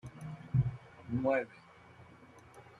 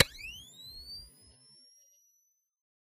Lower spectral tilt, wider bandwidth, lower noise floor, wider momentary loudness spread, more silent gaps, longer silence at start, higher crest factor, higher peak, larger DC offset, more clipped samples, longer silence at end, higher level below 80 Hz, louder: first, -9 dB/octave vs -2 dB/octave; second, 11 kHz vs 15.5 kHz; second, -57 dBFS vs -75 dBFS; first, 24 LU vs 17 LU; neither; about the same, 0.05 s vs 0 s; second, 20 dB vs 30 dB; second, -18 dBFS vs -8 dBFS; neither; neither; second, 0.1 s vs 1.75 s; about the same, -58 dBFS vs -60 dBFS; about the same, -36 LUFS vs -37 LUFS